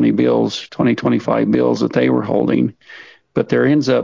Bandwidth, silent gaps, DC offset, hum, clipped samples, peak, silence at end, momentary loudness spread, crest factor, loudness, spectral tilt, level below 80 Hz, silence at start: 7.6 kHz; none; 0.1%; none; under 0.1%; -2 dBFS; 0 s; 6 LU; 14 dB; -16 LUFS; -7 dB/octave; -54 dBFS; 0 s